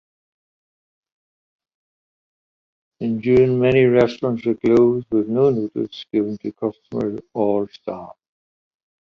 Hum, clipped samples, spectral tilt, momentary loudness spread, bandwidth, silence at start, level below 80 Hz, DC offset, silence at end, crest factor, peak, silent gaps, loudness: none; under 0.1%; -8.5 dB/octave; 12 LU; 6.8 kHz; 3 s; -54 dBFS; under 0.1%; 1.05 s; 18 dB; -4 dBFS; none; -19 LUFS